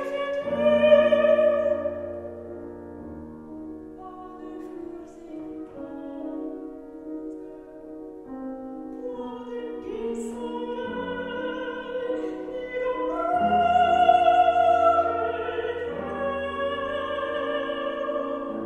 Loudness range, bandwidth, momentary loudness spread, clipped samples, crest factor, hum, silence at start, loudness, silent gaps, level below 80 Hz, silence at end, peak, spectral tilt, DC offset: 17 LU; 9.2 kHz; 21 LU; under 0.1%; 20 dB; none; 0 s; -25 LUFS; none; -56 dBFS; 0 s; -6 dBFS; -6 dB/octave; under 0.1%